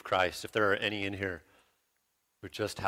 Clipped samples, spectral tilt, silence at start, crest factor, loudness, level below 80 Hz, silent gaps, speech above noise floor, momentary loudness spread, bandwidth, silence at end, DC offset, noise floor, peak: under 0.1%; -4 dB/octave; 0.05 s; 20 dB; -32 LUFS; -64 dBFS; none; 46 dB; 17 LU; 16.5 kHz; 0 s; under 0.1%; -78 dBFS; -14 dBFS